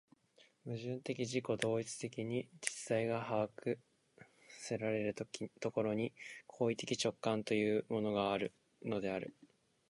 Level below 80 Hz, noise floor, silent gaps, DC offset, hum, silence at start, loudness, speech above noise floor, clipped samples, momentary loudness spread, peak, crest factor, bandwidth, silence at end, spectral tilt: -76 dBFS; -70 dBFS; none; under 0.1%; none; 0.65 s; -39 LUFS; 31 dB; under 0.1%; 10 LU; -12 dBFS; 28 dB; 11.5 kHz; 0.45 s; -5 dB/octave